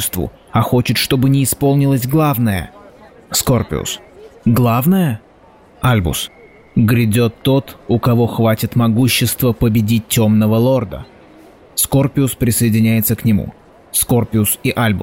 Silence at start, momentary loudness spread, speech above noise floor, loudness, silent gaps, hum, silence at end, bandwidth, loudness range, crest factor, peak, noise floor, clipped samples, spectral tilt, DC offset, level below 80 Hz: 0 s; 8 LU; 31 dB; -15 LUFS; none; none; 0 s; 16.5 kHz; 3 LU; 12 dB; -4 dBFS; -45 dBFS; under 0.1%; -5.5 dB/octave; 0.2%; -38 dBFS